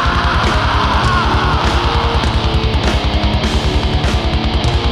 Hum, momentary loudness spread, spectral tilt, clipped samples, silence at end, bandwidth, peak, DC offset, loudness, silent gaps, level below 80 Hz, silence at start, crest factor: none; 2 LU; -5.5 dB/octave; under 0.1%; 0 s; 11.5 kHz; 0 dBFS; under 0.1%; -15 LUFS; none; -18 dBFS; 0 s; 12 dB